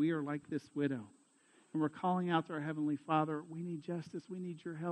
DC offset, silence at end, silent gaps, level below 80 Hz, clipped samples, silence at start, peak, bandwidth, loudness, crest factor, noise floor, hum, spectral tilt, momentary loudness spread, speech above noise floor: under 0.1%; 0 s; none; -84 dBFS; under 0.1%; 0 s; -18 dBFS; 9.2 kHz; -38 LUFS; 20 dB; -69 dBFS; none; -7.5 dB/octave; 10 LU; 31 dB